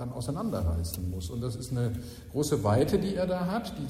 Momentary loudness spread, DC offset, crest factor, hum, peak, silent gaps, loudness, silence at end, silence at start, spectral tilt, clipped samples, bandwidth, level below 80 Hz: 9 LU; under 0.1%; 16 dB; none; -14 dBFS; none; -30 LUFS; 0 s; 0 s; -6.5 dB/octave; under 0.1%; 16 kHz; -44 dBFS